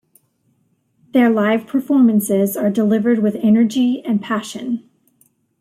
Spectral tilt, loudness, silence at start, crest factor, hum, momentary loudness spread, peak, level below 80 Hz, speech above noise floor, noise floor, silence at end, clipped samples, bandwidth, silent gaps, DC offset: -6 dB/octave; -17 LUFS; 1.15 s; 14 dB; none; 9 LU; -4 dBFS; -64 dBFS; 47 dB; -63 dBFS; 0.8 s; under 0.1%; 16 kHz; none; under 0.1%